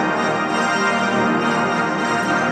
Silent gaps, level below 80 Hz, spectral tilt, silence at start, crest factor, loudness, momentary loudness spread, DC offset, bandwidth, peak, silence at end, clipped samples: none; -56 dBFS; -4.5 dB/octave; 0 s; 12 dB; -18 LUFS; 2 LU; under 0.1%; 12.5 kHz; -6 dBFS; 0 s; under 0.1%